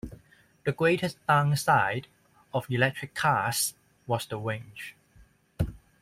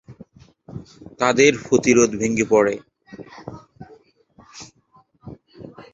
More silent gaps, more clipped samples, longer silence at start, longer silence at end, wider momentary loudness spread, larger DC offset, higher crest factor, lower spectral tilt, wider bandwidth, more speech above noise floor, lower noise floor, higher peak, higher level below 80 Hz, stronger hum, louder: neither; neither; about the same, 0.05 s vs 0.1 s; about the same, 0.25 s vs 0.15 s; second, 14 LU vs 26 LU; neither; about the same, 20 dB vs 22 dB; about the same, -4.5 dB/octave vs -4 dB/octave; first, 16 kHz vs 8 kHz; second, 32 dB vs 40 dB; about the same, -59 dBFS vs -57 dBFS; second, -8 dBFS vs -2 dBFS; about the same, -52 dBFS vs -56 dBFS; neither; second, -28 LUFS vs -17 LUFS